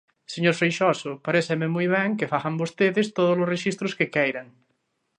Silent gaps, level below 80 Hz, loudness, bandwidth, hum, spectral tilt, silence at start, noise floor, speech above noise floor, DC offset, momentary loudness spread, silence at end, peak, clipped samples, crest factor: none; -70 dBFS; -24 LUFS; 10.5 kHz; none; -5.5 dB/octave; 0.3 s; -73 dBFS; 50 dB; under 0.1%; 6 LU; 0.75 s; -6 dBFS; under 0.1%; 18 dB